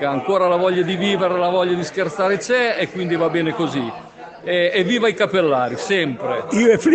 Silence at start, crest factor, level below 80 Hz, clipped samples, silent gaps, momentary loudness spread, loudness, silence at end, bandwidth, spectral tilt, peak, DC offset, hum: 0 s; 16 dB; -60 dBFS; under 0.1%; none; 6 LU; -18 LUFS; 0 s; 8.8 kHz; -5 dB/octave; -2 dBFS; under 0.1%; none